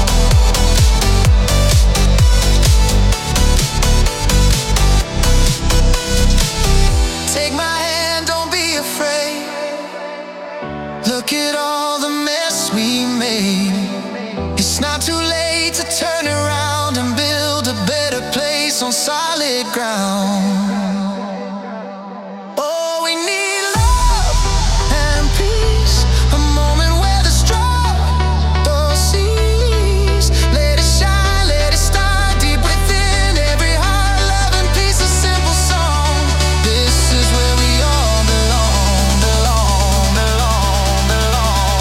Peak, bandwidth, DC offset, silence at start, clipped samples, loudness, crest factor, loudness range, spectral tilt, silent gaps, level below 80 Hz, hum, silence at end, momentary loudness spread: 0 dBFS; 16.5 kHz; under 0.1%; 0 s; under 0.1%; -15 LUFS; 14 dB; 5 LU; -4 dB/octave; none; -16 dBFS; none; 0 s; 6 LU